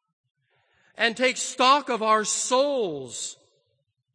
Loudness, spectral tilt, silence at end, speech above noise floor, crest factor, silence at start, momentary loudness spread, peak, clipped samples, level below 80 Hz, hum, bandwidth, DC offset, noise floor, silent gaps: -23 LUFS; -1.5 dB/octave; 0.8 s; 51 dB; 20 dB; 1 s; 13 LU; -6 dBFS; under 0.1%; -78 dBFS; none; 9.8 kHz; under 0.1%; -75 dBFS; none